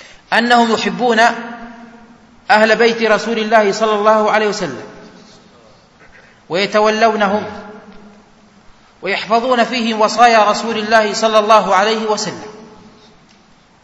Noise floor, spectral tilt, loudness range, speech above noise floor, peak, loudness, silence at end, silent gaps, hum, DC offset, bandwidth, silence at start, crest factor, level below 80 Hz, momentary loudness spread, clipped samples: -48 dBFS; -3.5 dB/octave; 6 LU; 35 dB; 0 dBFS; -13 LUFS; 1.2 s; none; none; under 0.1%; 11 kHz; 0.3 s; 16 dB; -56 dBFS; 16 LU; 0.1%